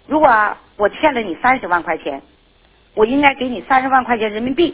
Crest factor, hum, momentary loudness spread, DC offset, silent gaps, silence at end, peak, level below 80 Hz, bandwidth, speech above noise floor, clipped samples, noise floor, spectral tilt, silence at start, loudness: 16 dB; none; 10 LU; under 0.1%; none; 0 s; 0 dBFS; -46 dBFS; 4 kHz; 37 dB; under 0.1%; -52 dBFS; -8 dB/octave; 0.1 s; -16 LUFS